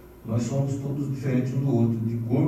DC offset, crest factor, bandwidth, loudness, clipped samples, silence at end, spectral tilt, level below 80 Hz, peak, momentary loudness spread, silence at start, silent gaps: under 0.1%; 14 dB; 13 kHz; -26 LUFS; under 0.1%; 0 s; -8.5 dB/octave; -54 dBFS; -12 dBFS; 6 LU; 0 s; none